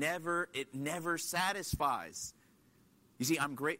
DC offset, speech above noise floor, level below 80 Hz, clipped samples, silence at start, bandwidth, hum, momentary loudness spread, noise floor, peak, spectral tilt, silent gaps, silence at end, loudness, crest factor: under 0.1%; 31 dB; -60 dBFS; under 0.1%; 0 s; 16 kHz; none; 7 LU; -67 dBFS; -20 dBFS; -3.5 dB/octave; none; 0 s; -36 LUFS; 18 dB